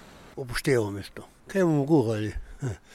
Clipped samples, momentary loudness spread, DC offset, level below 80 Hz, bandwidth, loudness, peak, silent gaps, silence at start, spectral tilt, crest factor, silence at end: under 0.1%; 18 LU; under 0.1%; -46 dBFS; 15.5 kHz; -27 LUFS; -10 dBFS; none; 0.05 s; -6.5 dB/octave; 16 dB; 0 s